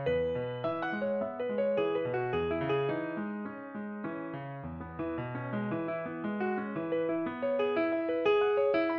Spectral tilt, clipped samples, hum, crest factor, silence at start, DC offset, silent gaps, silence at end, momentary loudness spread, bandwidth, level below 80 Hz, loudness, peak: -5 dB/octave; under 0.1%; none; 16 dB; 0 s; under 0.1%; none; 0 s; 11 LU; 6 kHz; -60 dBFS; -33 LUFS; -16 dBFS